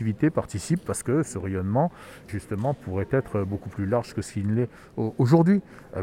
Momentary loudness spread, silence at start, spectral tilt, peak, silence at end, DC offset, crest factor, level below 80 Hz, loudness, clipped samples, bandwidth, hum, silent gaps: 11 LU; 0 s; -7.5 dB/octave; -6 dBFS; 0 s; under 0.1%; 20 dB; -54 dBFS; -26 LUFS; under 0.1%; 15.5 kHz; none; none